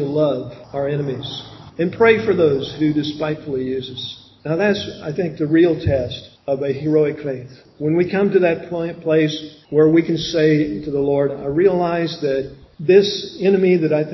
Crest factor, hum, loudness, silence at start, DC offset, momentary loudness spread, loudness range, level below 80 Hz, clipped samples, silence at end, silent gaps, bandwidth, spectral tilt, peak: 18 dB; none; -18 LUFS; 0 s; under 0.1%; 13 LU; 3 LU; -46 dBFS; under 0.1%; 0 s; none; 6.2 kHz; -7 dB/octave; 0 dBFS